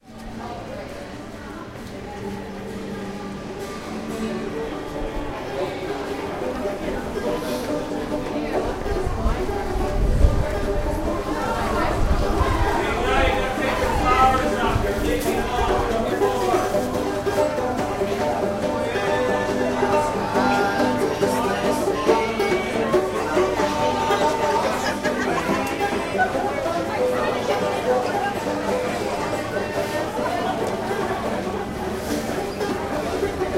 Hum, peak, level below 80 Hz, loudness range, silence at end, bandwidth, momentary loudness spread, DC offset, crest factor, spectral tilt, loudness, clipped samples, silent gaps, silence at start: none; -2 dBFS; -32 dBFS; 8 LU; 0 s; 16 kHz; 11 LU; under 0.1%; 20 dB; -5.5 dB/octave; -23 LUFS; under 0.1%; none; 0.05 s